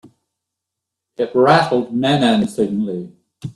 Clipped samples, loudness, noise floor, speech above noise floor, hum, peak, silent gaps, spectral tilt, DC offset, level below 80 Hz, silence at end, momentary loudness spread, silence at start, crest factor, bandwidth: under 0.1%; -16 LUFS; -82 dBFS; 66 dB; none; 0 dBFS; none; -6 dB/octave; under 0.1%; -58 dBFS; 0.05 s; 16 LU; 1.2 s; 18 dB; 12.5 kHz